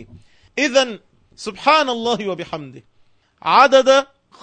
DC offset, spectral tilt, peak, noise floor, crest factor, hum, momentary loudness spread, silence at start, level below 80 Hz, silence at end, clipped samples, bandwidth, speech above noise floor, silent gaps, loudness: under 0.1%; -3 dB/octave; 0 dBFS; -56 dBFS; 18 dB; none; 20 LU; 0 s; -58 dBFS; 0.4 s; under 0.1%; 9.4 kHz; 39 dB; none; -16 LUFS